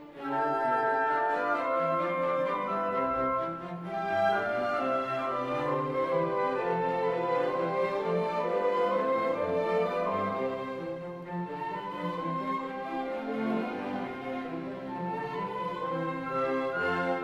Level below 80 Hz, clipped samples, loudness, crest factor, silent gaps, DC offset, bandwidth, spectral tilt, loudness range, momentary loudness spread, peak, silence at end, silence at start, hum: -66 dBFS; under 0.1%; -31 LUFS; 14 dB; none; under 0.1%; 11.5 kHz; -7 dB/octave; 5 LU; 8 LU; -16 dBFS; 0 s; 0 s; none